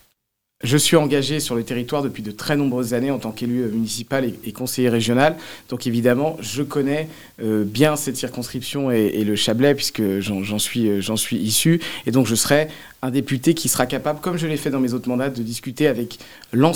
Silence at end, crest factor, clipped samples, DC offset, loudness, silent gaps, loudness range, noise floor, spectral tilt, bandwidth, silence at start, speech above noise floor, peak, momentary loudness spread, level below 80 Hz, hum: 0 s; 20 dB; under 0.1%; 0.4%; -20 LUFS; none; 3 LU; -73 dBFS; -4.5 dB/octave; 18 kHz; 0.6 s; 52 dB; 0 dBFS; 10 LU; -54 dBFS; none